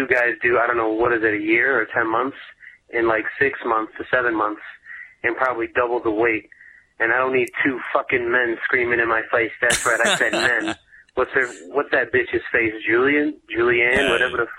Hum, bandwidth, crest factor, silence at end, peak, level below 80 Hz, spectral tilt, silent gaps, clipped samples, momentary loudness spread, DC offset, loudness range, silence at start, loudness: none; 15 kHz; 18 dB; 0 s; -2 dBFS; -52 dBFS; -3.5 dB/octave; none; under 0.1%; 8 LU; under 0.1%; 3 LU; 0 s; -20 LUFS